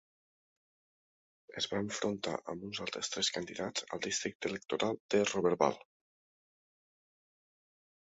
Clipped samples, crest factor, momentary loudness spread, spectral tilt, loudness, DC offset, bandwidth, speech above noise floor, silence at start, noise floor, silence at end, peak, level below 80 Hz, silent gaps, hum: under 0.1%; 26 dB; 9 LU; -2.5 dB/octave; -35 LUFS; under 0.1%; 8 kHz; over 55 dB; 1.5 s; under -90 dBFS; 2.35 s; -12 dBFS; -72 dBFS; 4.35-4.40 s, 5.00-5.09 s; none